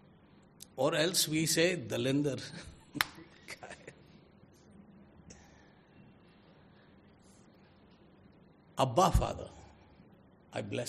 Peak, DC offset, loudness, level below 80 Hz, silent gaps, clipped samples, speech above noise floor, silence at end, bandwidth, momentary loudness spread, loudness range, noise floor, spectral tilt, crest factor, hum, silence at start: -4 dBFS; under 0.1%; -32 LUFS; -48 dBFS; none; under 0.1%; 30 dB; 0 s; 13.5 kHz; 26 LU; 21 LU; -61 dBFS; -4 dB/octave; 32 dB; none; 0.75 s